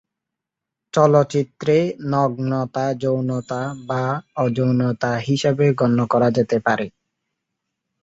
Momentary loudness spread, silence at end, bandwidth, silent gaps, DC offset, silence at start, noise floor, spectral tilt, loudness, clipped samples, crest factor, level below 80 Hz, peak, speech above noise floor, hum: 7 LU; 1.15 s; 8 kHz; none; under 0.1%; 0.95 s; -84 dBFS; -7 dB/octave; -20 LUFS; under 0.1%; 18 dB; -58 dBFS; -2 dBFS; 65 dB; none